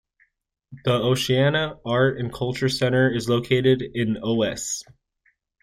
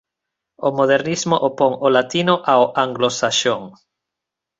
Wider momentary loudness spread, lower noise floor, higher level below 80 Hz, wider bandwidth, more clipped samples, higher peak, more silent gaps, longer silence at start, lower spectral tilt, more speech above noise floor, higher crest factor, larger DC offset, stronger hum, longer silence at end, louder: about the same, 8 LU vs 6 LU; second, -68 dBFS vs -84 dBFS; first, -52 dBFS vs -62 dBFS; first, 15 kHz vs 8 kHz; neither; second, -6 dBFS vs -2 dBFS; neither; about the same, 0.7 s vs 0.6 s; about the same, -5 dB/octave vs -4 dB/octave; second, 46 dB vs 66 dB; about the same, 18 dB vs 18 dB; neither; neither; about the same, 0.8 s vs 0.9 s; second, -22 LUFS vs -17 LUFS